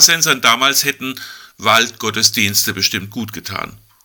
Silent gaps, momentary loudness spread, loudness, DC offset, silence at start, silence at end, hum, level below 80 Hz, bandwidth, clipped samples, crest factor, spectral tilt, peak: none; 15 LU; -13 LUFS; under 0.1%; 0 s; 0.3 s; none; -56 dBFS; over 20 kHz; 0.3%; 16 dB; -1 dB/octave; 0 dBFS